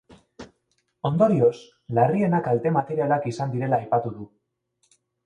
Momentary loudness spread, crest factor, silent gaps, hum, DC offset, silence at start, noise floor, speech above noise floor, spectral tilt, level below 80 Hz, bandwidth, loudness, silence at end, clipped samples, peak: 13 LU; 20 dB; none; none; under 0.1%; 0.4 s; -72 dBFS; 50 dB; -8.5 dB/octave; -62 dBFS; 9.8 kHz; -23 LUFS; 1 s; under 0.1%; -4 dBFS